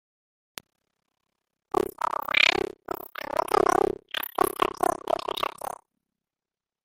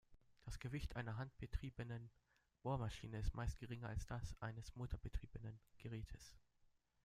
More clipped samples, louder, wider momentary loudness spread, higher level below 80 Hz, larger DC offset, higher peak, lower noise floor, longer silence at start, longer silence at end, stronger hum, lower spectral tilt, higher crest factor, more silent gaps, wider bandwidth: neither; first, -26 LUFS vs -50 LUFS; first, 19 LU vs 11 LU; about the same, -58 dBFS vs -54 dBFS; neither; first, -2 dBFS vs -30 dBFS; first, under -90 dBFS vs -78 dBFS; first, 1.75 s vs 0.1 s; first, 1.15 s vs 0.65 s; neither; second, -2.5 dB/octave vs -6.5 dB/octave; first, 28 dB vs 18 dB; neither; first, 17 kHz vs 15 kHz